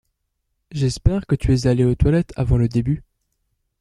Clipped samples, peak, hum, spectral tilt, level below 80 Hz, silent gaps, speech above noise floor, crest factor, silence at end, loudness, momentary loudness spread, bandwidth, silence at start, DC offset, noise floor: under 0.1%; -2 dBFS; none; -7.5 dB/octave; -30 dBFS; none; 56 dB; 18 dB; 0.8 s; -20 LUFS; 7 LU; 11 kHz; 0.7 s; under 0.1%; -74 dBFS